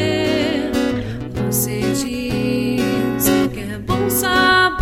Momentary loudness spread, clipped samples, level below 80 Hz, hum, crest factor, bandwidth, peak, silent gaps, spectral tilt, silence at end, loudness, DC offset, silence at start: 9 LU; under 0.1%; -38 dBFS; none; 16 dB; 16.5 kHz; -2 dBFS; none; -4 dB/octave; 0 s; -18 LUFS; under 0.1%; 0 s